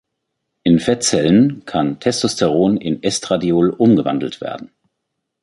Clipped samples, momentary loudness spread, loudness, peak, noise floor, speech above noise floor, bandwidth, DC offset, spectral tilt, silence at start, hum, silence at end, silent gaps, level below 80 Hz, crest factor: under 0.1%; 9 LU; -16 LUFS; -2 dBFS; -76 dBFS; 60 dB; 11.5 kHz; under 0.1%; -5 dB/octave; 0.65 s; none; 0.75 s; none; -50 dBFS; 16 dB